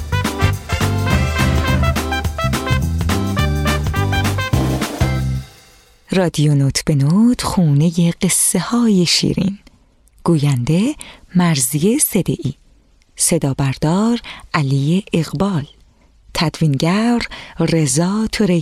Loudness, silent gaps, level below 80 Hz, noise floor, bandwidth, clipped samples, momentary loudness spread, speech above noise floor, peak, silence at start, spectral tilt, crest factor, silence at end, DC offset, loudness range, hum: -17 LUFS; none; -30 dBFS; -51 dBFS; 16.5 kHz; under 0.1%; 7 LU; 36 dB; -2 dBFS; 0 s; -5 dB/octave; 14 dB; 0 s; under 0.1%; 4 LU; none